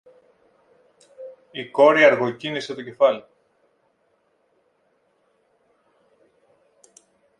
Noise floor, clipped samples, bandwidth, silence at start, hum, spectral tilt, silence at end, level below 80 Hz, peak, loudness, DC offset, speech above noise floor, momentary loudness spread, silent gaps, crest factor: -67 dBFS; under 0.1%; 9.8 kHz; 1.2 s; none; -5 dB/octave; 4.2 s; -76 dBFS; -2 dBFS; -19 LUFS; under 0.1%; 48 dB; 27 LU; none; 24 dB